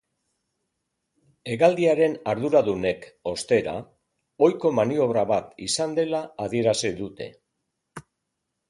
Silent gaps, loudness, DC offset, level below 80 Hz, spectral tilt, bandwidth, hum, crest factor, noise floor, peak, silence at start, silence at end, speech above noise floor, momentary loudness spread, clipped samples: none; -23 LUFS; under 0.1%; -60 dBFS; -5 dB/octave; 11.5 kHz; none; 20 dB; -80 dBFS; -4 dBFS; 1.45 s; 0.7 s; 57 dB; 13 LU; under 0.1%